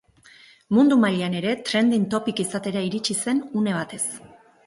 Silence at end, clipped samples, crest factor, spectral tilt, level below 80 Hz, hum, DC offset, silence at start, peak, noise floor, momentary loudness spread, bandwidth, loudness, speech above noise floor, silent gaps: 0.4 s; under 0.1%; 16 dB; -4.5 dB/octave; -64 dBFS; none; under 0.1%; 0.7 s; -8 dBFS; -52 dBFS; 9 LU; 11.5 kHz; -23 LUFS; 30 dB; none